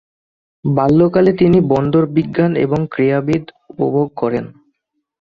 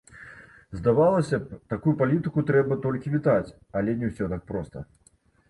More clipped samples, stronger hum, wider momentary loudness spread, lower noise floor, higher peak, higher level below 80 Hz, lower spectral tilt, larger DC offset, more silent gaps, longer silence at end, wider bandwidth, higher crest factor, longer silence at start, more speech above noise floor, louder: neither; neither; second, 9 LU vs 19 LU; first, -70 dBFS vs -48 dBFS; first, -2 dBFS vs -8 dBFS; about the same, -46 dBFS vs -50 dBFS; about the same, -9.5 dB/octave vs -9 dB/octave; neither; neither; about the same, 0.75 s vs 0.65 s; second, 7.2 kHz vs 11.5 kHz; about the same, 14 dB vs 16 dB; first, 0.65 s vs 0.1 s; first, 56 dB vs 24 dB; first, -15 LUFS vs -25 LUFS